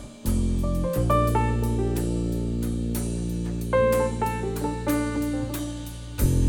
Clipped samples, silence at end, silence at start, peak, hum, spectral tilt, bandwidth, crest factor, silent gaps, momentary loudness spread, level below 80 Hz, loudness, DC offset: under 0.1%; 0 s; 0 s; -8 dBFS; none; -6.5 dB/octave; over 20 kHz; 16 dB; none; 8 LU; -30 dBFS; -26 LUFS; under 0.1%